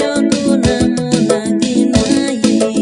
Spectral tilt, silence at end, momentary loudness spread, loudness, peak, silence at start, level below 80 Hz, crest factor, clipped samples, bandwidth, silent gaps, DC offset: -5 dB/octave; 0 s; 2 LU; -13 LUFS; 0 dBFS; 0 s; -36 dBFS; 12 dB; under 0.1%; 11 kHz; none; under 0.1%